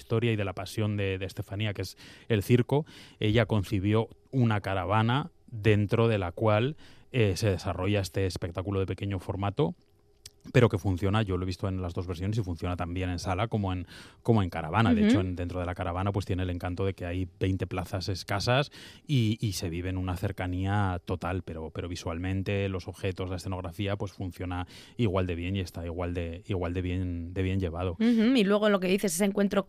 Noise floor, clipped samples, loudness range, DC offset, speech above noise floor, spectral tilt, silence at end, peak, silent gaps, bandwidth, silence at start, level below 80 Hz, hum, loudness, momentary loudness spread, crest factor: -55 dBFS; under 0.1%; 5 LU; under 0.1%; 26 dB; -6.5 dB/octave; 0.05 s; -8 dBFS; none; 15 kHz; 0 s; -54 dBFS; none; -29 LUFS; 10 LU; 20 dB